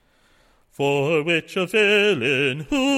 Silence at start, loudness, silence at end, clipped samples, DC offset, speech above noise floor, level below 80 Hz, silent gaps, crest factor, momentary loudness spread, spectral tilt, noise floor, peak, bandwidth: 0.8 s; -20 LUFS; 0 s; under 0.1%; under 0.1%; 39 dB; -52 dBFS; none; 14 dB; 6 LU; -4.5 dB/octave; -59 dBFS; -6 dBFS; 15.5 kHz